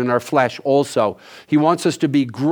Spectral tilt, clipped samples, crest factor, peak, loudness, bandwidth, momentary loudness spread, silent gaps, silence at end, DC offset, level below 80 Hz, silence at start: -6 dB/octave; under 0.1%; 16 dB; -2 dBFS; -18 LUFS; 18.5 kHz; 4 LU; none; 0 s; under 0.1%; -66 dBFS; 0 s